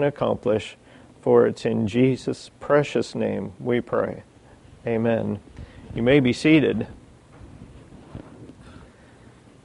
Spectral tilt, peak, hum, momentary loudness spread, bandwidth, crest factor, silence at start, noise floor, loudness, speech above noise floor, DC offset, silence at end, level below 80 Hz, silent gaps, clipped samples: -7 dB/octave; -4 dBFS; none; 21 LU; 11 kHz; 20 dB; 0 s; -50 dBFS; -22 LUFS; 28 dB; under 0.1%; 0.8 s; -52 dBFS; none; under 0.1%